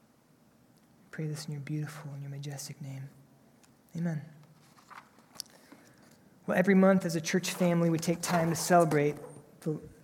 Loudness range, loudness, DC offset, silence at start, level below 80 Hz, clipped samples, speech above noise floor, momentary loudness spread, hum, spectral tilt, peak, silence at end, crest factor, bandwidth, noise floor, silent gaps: 16 LU; -30 LUFS; under 0.1%; 1.15 s; -72 dBFS; under 0.1%; 35 dB; 20 LU; none; -5.5 dB/octave; -12 dBFS; 0.1 s; 20 dB; 17 kHz; -64 dBFS; none